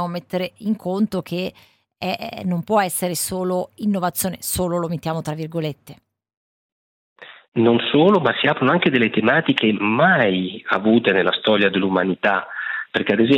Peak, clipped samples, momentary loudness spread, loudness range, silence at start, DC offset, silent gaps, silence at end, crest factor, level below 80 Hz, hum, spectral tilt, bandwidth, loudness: -2 dBFS; under 0.1%; 11 LU; 8 LU; 0 s; under 0.1%; 6.37-7.16 s, 7.48-7.52 s; 0 s; 18 dB; -54 dBFS; none; -4.5 dB/octave; 17 kHz; -19 LUFS